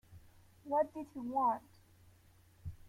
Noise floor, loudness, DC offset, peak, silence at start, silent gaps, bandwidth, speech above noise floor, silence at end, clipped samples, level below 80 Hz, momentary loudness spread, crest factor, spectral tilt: -65 dBFS; -37 LUFS; under 0.1%; -22 dBFS; 0.1 s; none; 16.5 kHz; 29 dB; 0 s; under 0.1%; -64 dBFS; 18 LU; 18 dB; -8 dB/octave